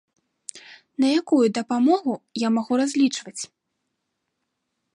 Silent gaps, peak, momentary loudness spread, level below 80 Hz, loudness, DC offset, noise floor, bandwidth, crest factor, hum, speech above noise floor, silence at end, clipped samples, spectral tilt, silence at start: none; -8 dBFS; 19 LU; -78 dBFS; -22 LUFS; under 0.1%; -78 dBFS; 11 kHz; 16 dB; none; 57 dB; 1.5 s; under 0.1%; -4 dB/octave; 0.55 s